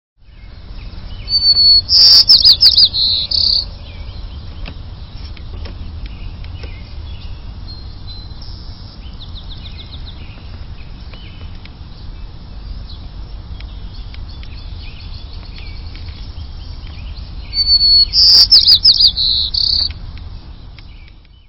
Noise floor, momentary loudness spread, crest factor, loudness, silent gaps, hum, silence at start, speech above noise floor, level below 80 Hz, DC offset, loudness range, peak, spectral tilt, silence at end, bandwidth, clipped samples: -39 dBFS; 28 LU; 16 dB; -7 LUFS; none; none; 0.35 s; 30 dB; -30 dBFS; under 0.1%; 25 LU; 0 dBFS; -3 dB/octave; 0.35 s; 8 kHz; 0.2%